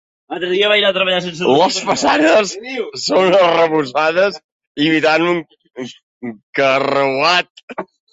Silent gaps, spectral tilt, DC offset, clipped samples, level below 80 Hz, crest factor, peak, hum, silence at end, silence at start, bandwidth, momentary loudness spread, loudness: 4.44-4.60 s, 4.67-4.75 s, 6.03-6.21 s, 6.43-6.53 s, 7.50-7.55 s, 7.63-7.68 s; -3.5 dB/octave; under 0.1%; under 0.1%; -60 dBFS; 14 dB; -2 dBFS; none; 0.3 s; 0.3 s; 8 kHz; 19 LU; -14 LUFS